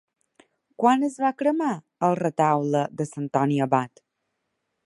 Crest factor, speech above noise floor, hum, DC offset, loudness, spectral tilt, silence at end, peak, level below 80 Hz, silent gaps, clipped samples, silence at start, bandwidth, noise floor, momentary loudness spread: 20 dB; 55 dB; none; under 0.1%; -24 LUFS; -7 dB/octave; 1 s; -6 dBFS; -72 dBFS; none; under 0.1%; 0.8 s; 11.5 kHz; -78 dBFS; 7 LU